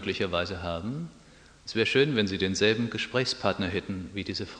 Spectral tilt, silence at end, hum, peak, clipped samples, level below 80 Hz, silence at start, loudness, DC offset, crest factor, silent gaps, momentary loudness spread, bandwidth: -4.5 dB/octave; 0 s; none; -8 dBFS; under 0.1%; -56 dBFS; 0 s; -28 LUFS; under 0.1%; 20 dB; none; 12 LU; 10 kHz